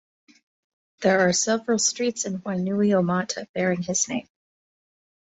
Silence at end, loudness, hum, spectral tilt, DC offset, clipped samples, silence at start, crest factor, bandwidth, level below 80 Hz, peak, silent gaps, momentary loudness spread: 1 s; -23 LUFS; none; -4 dB/octave; under 0.1%; under 0.1%; 1 s; 20 dB; 8.2 kHz; -66 dBFS; -6 dBFS; 3.49-3.54 s; 8 LU